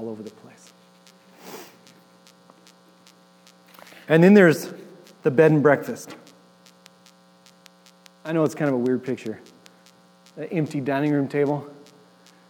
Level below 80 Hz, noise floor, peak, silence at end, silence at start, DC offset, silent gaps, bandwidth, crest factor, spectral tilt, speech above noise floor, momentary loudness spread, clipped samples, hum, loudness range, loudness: -84 dBFS; -54 dBFS; -2 dBFS; 0.75 s; 0 s; under 0.1%; none; 19.5 kHz; 22 dB; -7 dB/octave; 34 dB; 26 LU; under 0.1%; 60 Hz at -50 dBFS; 9 LU; -20 LUFS